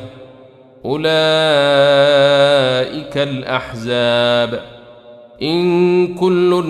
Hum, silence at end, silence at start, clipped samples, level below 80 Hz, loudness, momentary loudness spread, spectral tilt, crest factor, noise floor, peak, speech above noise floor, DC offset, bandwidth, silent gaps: none; 0 s; 0 s; under 0.1%; -52 dBFS; -14 LUFS; 10 LU; -5.5 dB/octave; 14 dB; -42 dBFS; -2 dBFS; 29 dB; under 0.1%; 12 kHz; none